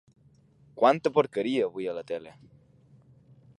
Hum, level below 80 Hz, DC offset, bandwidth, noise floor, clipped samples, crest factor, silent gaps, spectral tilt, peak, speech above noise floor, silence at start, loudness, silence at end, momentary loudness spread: none; -72 dBFS; under 0.1%; 11 kHz; -60 dBFS; under 0.1%; 22 dB; none; -6.5 dB/octave; -8 dBFS; 34 dB; 0.75 s; -27 LUFS; 1.3 s; 13 LU